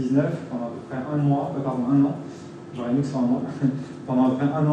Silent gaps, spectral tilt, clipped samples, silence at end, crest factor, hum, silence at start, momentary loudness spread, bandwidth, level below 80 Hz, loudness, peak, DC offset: none; -9 dB/octave; under 0.1%; 0 s; 14 dB; none; 0 s; 12 LU; 8.8 kHz; -64 dBFS; -24 LUFS; -8 dBFS; under 0.1%